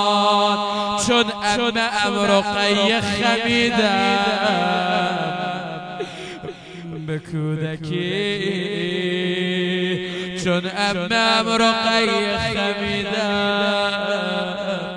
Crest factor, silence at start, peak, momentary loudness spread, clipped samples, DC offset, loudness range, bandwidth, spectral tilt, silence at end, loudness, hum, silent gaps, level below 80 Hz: 18 dB; 0 s; -4 dBFS; 11 LU; under 0.1%; under 0.1%; 7 LU; 11 kHz; -4 dB/octave; 0 s; -20 LUFS; none; none; -52 dBFS